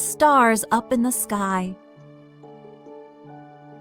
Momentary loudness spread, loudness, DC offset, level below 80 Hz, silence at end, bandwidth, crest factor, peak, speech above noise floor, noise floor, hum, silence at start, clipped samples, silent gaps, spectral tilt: 13 LU; -20 LUFS; under 0.1%; -60 dBFS; 0 s; over 20 kHz; 18 dB; -6 dBFS; 27 dB; -47 dBFS; none; 0 s; under 0.1%; none; -4 dB/octave